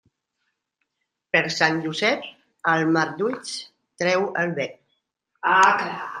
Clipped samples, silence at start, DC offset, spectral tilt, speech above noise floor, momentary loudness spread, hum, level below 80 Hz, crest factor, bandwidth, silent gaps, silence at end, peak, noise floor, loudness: under 0.1%; 1.35 s; under 0.1%; -4 dB/octave; 58 dB; 13 LU; none; -70 dBFS; 22 dB; 11 kHz; none; 0 s; -2 dBFS; -80 dBFS; -22 LUFS